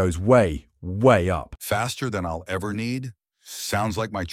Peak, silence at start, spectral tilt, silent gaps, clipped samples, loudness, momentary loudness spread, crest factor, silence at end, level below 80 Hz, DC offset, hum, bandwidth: -4 dBFS; 0 s; -5.5 dB/octave; none; under 0.1%; -23 LUFS; 14 LU; 18 dB; 0 s; -42 dBFS; under 0.1%; none; 16.5 kHz